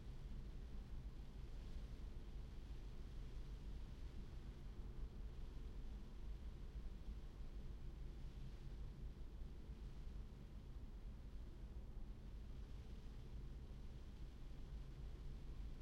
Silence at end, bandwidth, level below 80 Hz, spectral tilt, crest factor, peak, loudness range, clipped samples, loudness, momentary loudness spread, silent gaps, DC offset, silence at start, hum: 0 s; 10.5 kHz; -52 dBFS; -7 dB/octave; 12 dB; -40 dBFS; 1 LU; under 0.1%; -57 LUFS; 2 LU; none; under 0.1%; 0 s; none